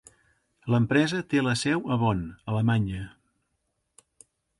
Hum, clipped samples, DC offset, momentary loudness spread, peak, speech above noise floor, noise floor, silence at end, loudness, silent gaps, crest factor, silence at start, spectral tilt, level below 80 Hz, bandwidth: none; under 0.1%; under 0.1%; 11 LU; -10 dBFS; 52 dB; -77 dBFS; 1.5 s; -26 LUFS; none; 18 dB; 0.65 s; -6 dB/octave; -52 dBFS; 11.5 kHz